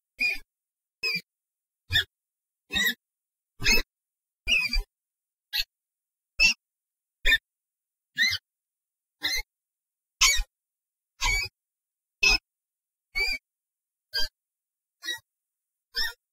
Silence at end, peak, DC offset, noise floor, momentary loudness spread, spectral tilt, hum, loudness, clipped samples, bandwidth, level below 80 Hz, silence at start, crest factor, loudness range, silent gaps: 0.2 s; -8 dBFS; under 0.1%; under -90 dBFS; 14 LU; 0 dB/octave; none; -26 LUFS; under 0.1%; 16 kHz; -40 dBFS; 0.2 s; 22 dB; 4 LU; none